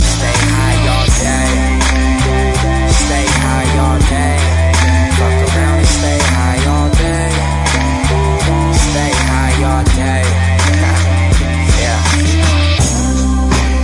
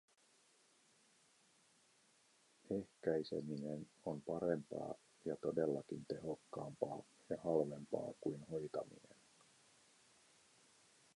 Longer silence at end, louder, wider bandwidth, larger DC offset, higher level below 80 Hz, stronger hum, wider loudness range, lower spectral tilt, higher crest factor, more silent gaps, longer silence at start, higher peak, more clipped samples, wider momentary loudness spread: second, 0 s vs 2.15 s; first, -12 LUFS vs -44 LUFS; about the same, 11.5 kHz vs 11.5 kHz; neither; first, -16 dBFS vs -78 dBFS; neither; second, 1 LU vs 5 LU; second, -4.5 dB/octave vs -7 dB/octave; second, 10 dB vs 24 dB; neither; second, 0 s vs 2.7 s; first, 0 dBFS vs -22 dBFS; neither; second, 2 LU vs 9 LU